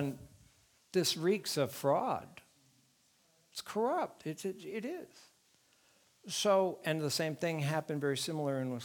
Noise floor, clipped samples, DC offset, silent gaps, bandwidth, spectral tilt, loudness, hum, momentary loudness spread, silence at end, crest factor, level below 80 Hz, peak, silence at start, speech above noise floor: -71 dBFS; under 0.1%; under 0.1%; none; 19.5 kHz; -4.5 dB/octave; -35 LUFS; none; 14 LU; 0 s; 18 dB; -76 dBFS; -18 dBFS; 0 s; 36 dB